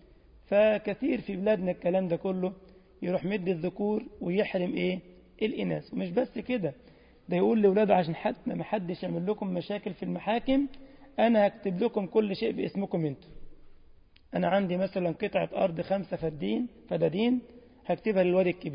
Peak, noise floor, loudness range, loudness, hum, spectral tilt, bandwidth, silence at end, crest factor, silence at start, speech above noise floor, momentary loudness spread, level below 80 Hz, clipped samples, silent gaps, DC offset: -10 dBFS; -56 dBFS; 3 LU; -29 LUFS; none; -11 dB/octave; 5.4 kHz; 0 s; 18 dB; 0.5 s; 28 dB; 10 LU; -60 dBFS; under 0.1%; none; under 0.1%